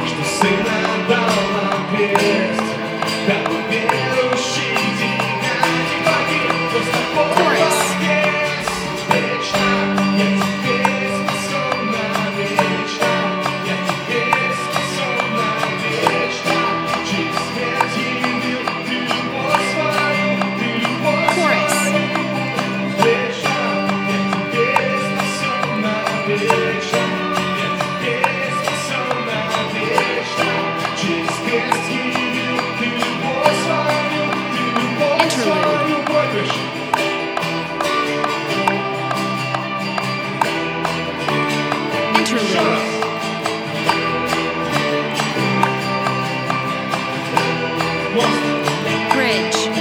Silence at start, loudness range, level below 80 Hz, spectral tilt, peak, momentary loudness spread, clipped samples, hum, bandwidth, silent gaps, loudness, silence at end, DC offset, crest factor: 0 s; 2 LU; -54 dBFS; -4 dB/octave; 0 dBFS; 5 LU; under 0.1%; none; 20 kHz; none; -18 LUFS; 0 s; under 0.1%; 18 dB